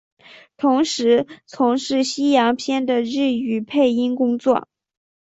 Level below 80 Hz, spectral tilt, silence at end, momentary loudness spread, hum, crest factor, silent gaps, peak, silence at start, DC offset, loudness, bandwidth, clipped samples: -64 dBFS; -4 dB/octave; 0.6 s; 5 LU; none; 16 dB; none; -4 dBFS; 0.6 s; under 0.1%; -19 LUFS; 8 kHz; under 0.1%